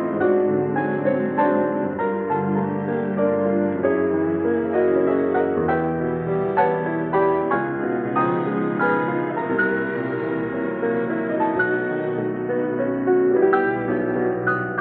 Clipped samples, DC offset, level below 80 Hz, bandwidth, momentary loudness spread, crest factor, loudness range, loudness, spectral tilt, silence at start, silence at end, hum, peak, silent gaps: under 0.1%; under 0.1%; -56 dBFS; 4.2 kHz; 5 LU; 16 dB; 2 LU; -21 LUFS; -12 dB/octave; 0 s; 0 s; none; -6 dBFS; none